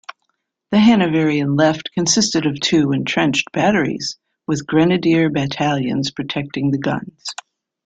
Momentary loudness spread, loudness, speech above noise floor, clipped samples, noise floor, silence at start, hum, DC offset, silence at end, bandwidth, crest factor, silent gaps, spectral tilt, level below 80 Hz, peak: 10 LU; -17 LUFS; 54 dB; under 0.1%; -71 dBFS; 0.1 s; none; under 0.1%; 0.55 s; 9.4 kHz; 16 dB; none; -4.5 dB/octave; -54 dBFS; -2 dBFS